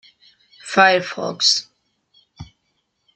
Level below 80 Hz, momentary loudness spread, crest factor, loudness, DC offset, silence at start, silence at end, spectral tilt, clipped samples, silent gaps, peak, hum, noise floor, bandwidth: -60 dBFS; 12 LU; 20 dB; -17 LUFS; under 0.1%; 0.65 s; 0.7 s; -2 dB/octave; under 0.1%; none; -2 dBFS; none; -70 dBFS; 11 kHz